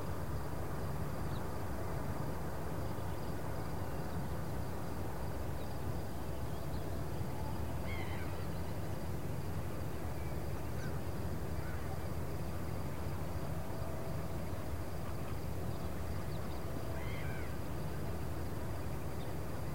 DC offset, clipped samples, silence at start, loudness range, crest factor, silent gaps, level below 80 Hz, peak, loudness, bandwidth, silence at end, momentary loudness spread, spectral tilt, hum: 1%; under 0.1%; 0 s; 1 LU; 12 dB; none; -50 dBFS; -26 dBFS; -42 LUFS; 16.5 kHz; 0 s; 1 LU; -6.5 dB/octave; none